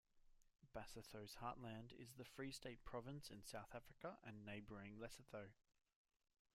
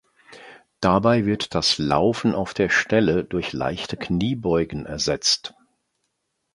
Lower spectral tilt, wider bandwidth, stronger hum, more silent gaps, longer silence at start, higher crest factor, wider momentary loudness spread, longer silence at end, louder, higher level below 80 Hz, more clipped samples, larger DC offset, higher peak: about the same, -4.5 dB/octave vs -4.5 dB/octave; first, 16 kHz vs 11.5 kHz; neither; neither; second, 0.15 s vs 0.3 s; about the same, 20 dB vs 20 dB; about the same, 6 LU vs 8 LU; about the same, 1 s vs 1.05 s; second, -57 LUFS vs -22 LUFS; second, -72 dBFS vs -46 dBFS; neither; neither; second, -38 dBFS vs -4 dBFS